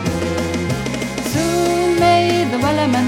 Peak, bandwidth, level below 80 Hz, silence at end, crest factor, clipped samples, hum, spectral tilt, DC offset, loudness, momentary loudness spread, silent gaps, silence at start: -4 dBFS; 16.5 kHz; -38 dBFS; 0 s; 14 dB; under 0.1%; none; -5 dB/octave; under 0.1%; -17 LUFS; 8 LU; none; 0 s